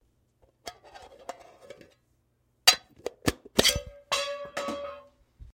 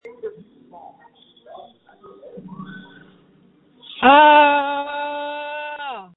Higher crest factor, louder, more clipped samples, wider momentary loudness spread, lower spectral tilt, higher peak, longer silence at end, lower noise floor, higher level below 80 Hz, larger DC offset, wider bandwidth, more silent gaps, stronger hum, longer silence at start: first, 28 dB vs 20 dB; second, -26 LUFS vs -16 LUFS; neither; second, 24 LU vs 27 LU; second, -1.5 dB/octave vs -7.5 dB/octave; second, -4 dBFS vs 0 dBFS; about the same, 0.05 s vs 0.1 s; first, -71 dBFS vs -55 dBFS; first, -52 dBFS vs -60 dBFS; neither; first, 16.5 kHz vs 4.1 kHz; neither; neither; first, 0.65 s vs 0.05 s